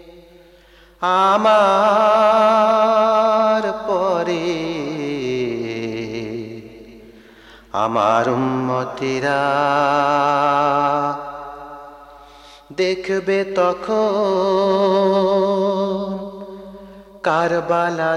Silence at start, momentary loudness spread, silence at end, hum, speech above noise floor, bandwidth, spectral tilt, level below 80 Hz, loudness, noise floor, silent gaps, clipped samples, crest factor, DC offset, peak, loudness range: 0.05 s; 15 LU; 0 s; none; 32 dB; 11.5 kHz; -5.5 dB/octave; -54 dBFS; -17 LUFS; -48 dBFS; none; under 0.1%; 14 dB; under 0.1%; -4 dBFS; 8 LU